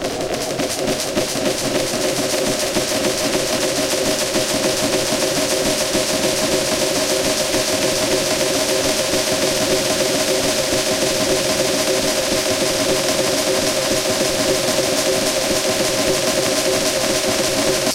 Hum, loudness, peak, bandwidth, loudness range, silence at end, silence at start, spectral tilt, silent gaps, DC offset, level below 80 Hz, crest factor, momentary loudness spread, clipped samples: none; -17 LUFS; -2 dBFS; 17 kHz; 1 LU; 0 s; 0 s; -2 dB/octave; none; under 0.1%; -42 dBFS; 16 dB; 2 LU; under 0.1%